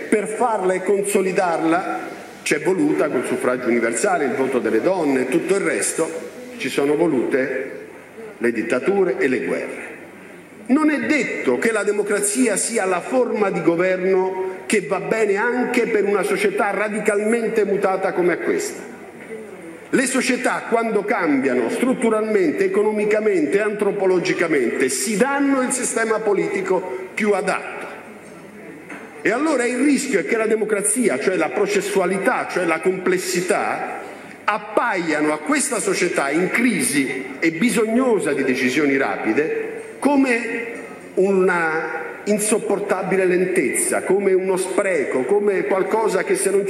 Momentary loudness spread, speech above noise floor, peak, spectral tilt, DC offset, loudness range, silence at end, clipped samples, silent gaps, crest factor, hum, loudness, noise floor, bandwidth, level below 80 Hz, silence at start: 10 LU; 21 dB; -2 dBFS; -4 dB/octave; under 0.1%; 3 LU; 0 s; under 0.1%; none; 16 dB; none; -19 LUFS; -40 dBFS; 13 kHz; -68 dBFS; 0 s